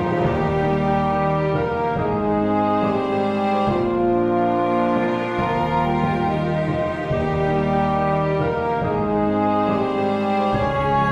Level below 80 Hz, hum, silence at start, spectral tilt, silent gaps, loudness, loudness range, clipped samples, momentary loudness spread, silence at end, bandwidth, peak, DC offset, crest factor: -40 dBFS; none; 0 s; -8.5 dB/octave; none; -20 LUFS; 1 LU; under 0.1%; 2 LU; 0 s; 9 kHz; -6 dBFS; 0.1%; 14 dB